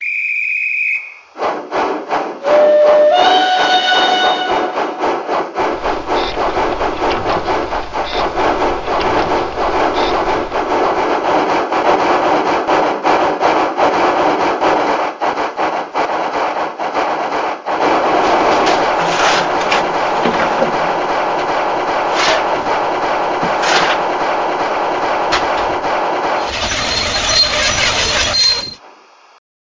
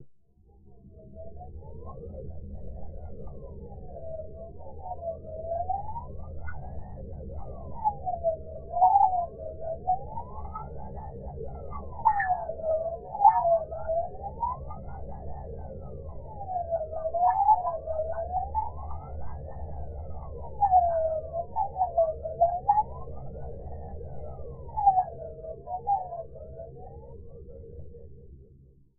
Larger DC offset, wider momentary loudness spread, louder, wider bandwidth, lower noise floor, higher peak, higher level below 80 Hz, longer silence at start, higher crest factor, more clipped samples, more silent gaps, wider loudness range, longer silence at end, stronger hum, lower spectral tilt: neither; second, 7 LU vs 21 LU; first, -14 LUFS vs -29 LUFS; first, 7.6 kHz vs 2.3 kHz; second, -44 dBFS vs -58 dBFS; first, 0 dBFS vs -6 dBFS; first, -38 dBFS vs -44 dBFS; about the same, 0 s vs 0 s; second, 14 dB vs 24 dB; neither; neither; second, 5 LU vs 13 LU; first, 0.8 s vs 0.35 s; neither; about the same, -2.5 dB/octave vs -2.5 dB/octave